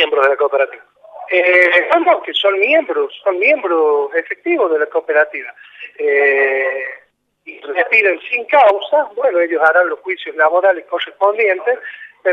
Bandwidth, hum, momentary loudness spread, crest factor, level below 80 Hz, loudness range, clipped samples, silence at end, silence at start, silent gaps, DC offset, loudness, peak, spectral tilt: 7 kHz; 50 Hz at -80 dBFS; 11 LU; 14 dB; -70 dBFS; 3 LU; under 0.1%; 0 s; 0 s; none; under 0.1%; -14 LUFS; 0 dBFS; -3 dB/octave